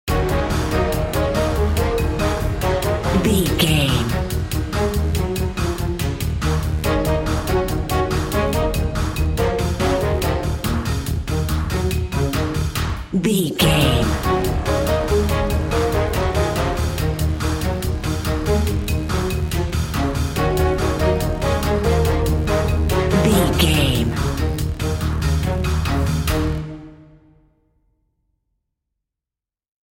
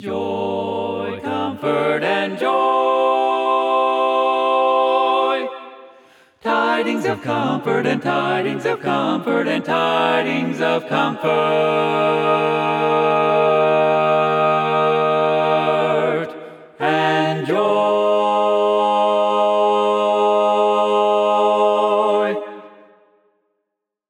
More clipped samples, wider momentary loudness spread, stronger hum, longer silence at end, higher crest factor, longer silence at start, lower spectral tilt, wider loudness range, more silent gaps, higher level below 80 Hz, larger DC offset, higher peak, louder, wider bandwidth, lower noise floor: neither; about the same, 6 LU vs 7 LU; neither; first, 2.95 s vs 1.4 s; about the same, 16 dB vs 16 dB; about the same, 0.05 s vs 0 s; about the same, -5.5 dB/octave vs -6 dB/octave; about the same, 3 LU vs 3 LU; neither; first, -26 dBFS vs -74 dBFS; neither; about the same, -2 dBFS vs -2 dBFS; about the same, -20 LUFS vs -18 LUFS; first, 17 kHz vs 11.5 kHz; first, -89 dBFS vs -78 dBFS